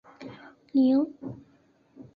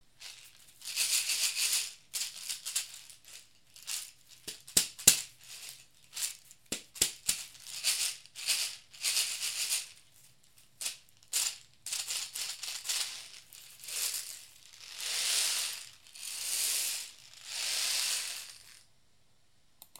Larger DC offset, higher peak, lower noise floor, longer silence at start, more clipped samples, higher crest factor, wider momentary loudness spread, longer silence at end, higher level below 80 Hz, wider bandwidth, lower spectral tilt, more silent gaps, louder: neither; second, -14 dBFS vs -4 dBFS; second, -63 dBFS vs -71 dBFS; about the same, 0.2 s vs 0.2 s; neither; second, 16 dB vs 32 dB; first, 23 LU vs 20 LU; second, 0.15 s vs 1.25 s; about the same, -70 dBFS vs -70 dBFS; second, 5 kHz vs 17 kHz; first, -9 dB/octave vs 2 dB/octave; neither; first, -25 LUFS vs -32 LUFS